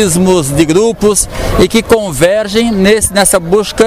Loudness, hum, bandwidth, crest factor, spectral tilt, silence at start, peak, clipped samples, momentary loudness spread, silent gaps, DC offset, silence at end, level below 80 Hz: -9 LUFS; none; 16.5 kHz; 10 dB; -4 dB/octave; 0 s; 0 dBFS; 0.2%; 4 LU; none; 0.9%; 0 s; -26 dBFS